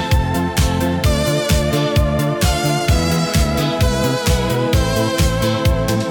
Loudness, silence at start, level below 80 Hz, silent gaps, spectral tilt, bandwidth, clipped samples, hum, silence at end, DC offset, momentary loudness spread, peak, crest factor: -17 LUFS; 0 s; -22 dBFS; none; -5 dB/octave; 19 kHz; under 0.1%; none; 0 s; under 0.1%; 1 LU; -4 dBFS; 12 dB